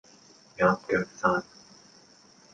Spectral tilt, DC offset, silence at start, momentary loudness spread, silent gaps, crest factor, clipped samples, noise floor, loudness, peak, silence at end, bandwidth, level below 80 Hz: -6 dB/octave; under 0.1%; 0.6 s; 21 LU; none; 20 dB; under 0.1%; -57 dBFS; -27 LUFS; -10 dBFS; 1.1 s; 9.2 kHz; -62 dBFS